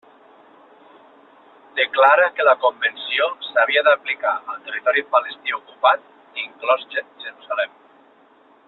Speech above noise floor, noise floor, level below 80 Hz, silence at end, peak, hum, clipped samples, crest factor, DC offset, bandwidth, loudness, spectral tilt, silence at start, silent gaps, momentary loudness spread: 34 dB; -53 dBFS; -76 dBFS; 1 s; -2 dBFS; none; under 0.1%; 18 dB; under 0.1%; 4.3 kHz; -19 LUFS; -3.5 dB/octave; 1.75 s; none; 14 LU